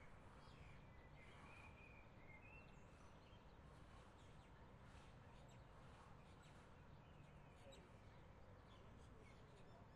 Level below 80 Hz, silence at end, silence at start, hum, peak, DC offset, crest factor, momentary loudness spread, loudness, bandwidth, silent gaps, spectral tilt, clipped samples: -70 dBFS; 0 s; 0 s; none; -50 dBFS; under 0.1%; 14 dB; 3 LU; -65 LUFS; 11 kHz; none; -5.5 dB/octave; under 0.1%